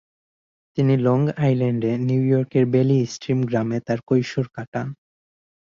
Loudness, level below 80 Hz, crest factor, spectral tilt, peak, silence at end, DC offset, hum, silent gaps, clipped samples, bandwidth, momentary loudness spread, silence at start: -21 LUFS; -58 dBFS; 16 dB; -8 dB/octave; -6 dBFS; 0.85 s; under 0.1%; none; 4.68-4.72 s; under 0.1%; 7.4 kHz; 10 LU; 0.75 s